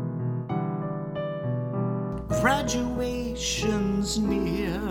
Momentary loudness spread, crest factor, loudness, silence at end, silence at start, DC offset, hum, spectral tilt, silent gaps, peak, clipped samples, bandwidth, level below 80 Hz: 7 LU; 18 dB; -27 LUFS; 0 s; 0 s; under 0.1%; none; -5 dB/octave; none; -10 dBFS; under 0.1%; 17 kHz; -42 dBFS